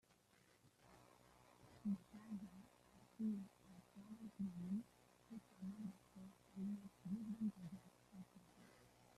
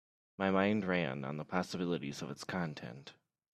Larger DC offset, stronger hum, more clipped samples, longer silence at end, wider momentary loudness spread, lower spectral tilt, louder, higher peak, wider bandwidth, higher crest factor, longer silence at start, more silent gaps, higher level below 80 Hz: neither; neither; neither; second, 0 s vs 0.4 s; first, 21 LU vs 16 LU; first, -7.5 dB/octave vs -6 dB/octave; second, -52 LUFS vs -36 LUFS; second, -36 dBFS vs -14 dBFS; about the same, 13.5 kHz vs 13 kHz; second, 16 dB vs 22 dB; second, 0.1 s vs 0.4 s; neither; second, -82 dBFS vs -74 dBFS